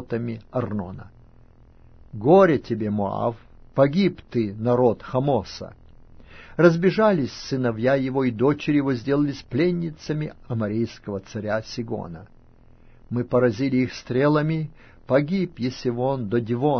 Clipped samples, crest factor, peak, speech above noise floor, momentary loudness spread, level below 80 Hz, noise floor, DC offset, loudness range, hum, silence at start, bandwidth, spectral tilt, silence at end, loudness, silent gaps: under 0.1%; 20 dB; -2 dBFS; 28 dB; 13 LU; -50 dBFS; -50 dBFS; under 0.1%; 6 LU; none; 0 s; 6.6 kHz; -8 dB/octave; 0 s; -23 LUFS; none